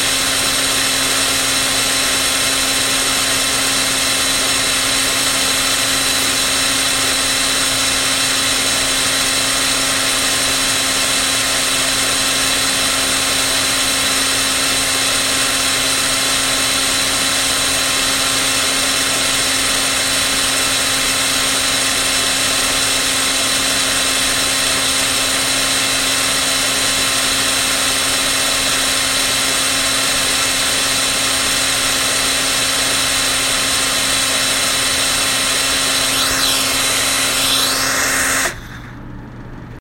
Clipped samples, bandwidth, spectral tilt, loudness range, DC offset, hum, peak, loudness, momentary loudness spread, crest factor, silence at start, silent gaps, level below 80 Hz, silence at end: under 0.1%; 16.5 kHz; 0 dB/octave; 0 LU; under 0.1%; none; -2 dBFS; -13 LUFS; 0 LU; 14 dB; 0 s; none; -38 dBFS; 0 s